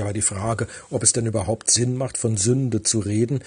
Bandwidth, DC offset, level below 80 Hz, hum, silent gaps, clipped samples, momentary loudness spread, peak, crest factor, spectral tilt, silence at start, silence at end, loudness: 10.5 kHz; under 0.1%; -52 dBFS; none; none; under 0.1%; 7 LU; -2 dBFS; 20 dB; -4 dB/octave; 0 s; 0 s; -21 LUFS